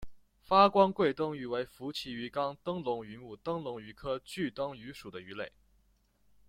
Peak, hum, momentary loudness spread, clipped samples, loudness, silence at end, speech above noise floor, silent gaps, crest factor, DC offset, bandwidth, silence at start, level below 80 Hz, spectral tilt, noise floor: -10 dBFS; none; 19 LU; under 0.1%; -32 LUFS; 1 s; 38 dB; none; 24 dB; under 0.1%; 15.5 kHz; 0 s; -62 dBFS; -6 dB/octave; -70 dBFS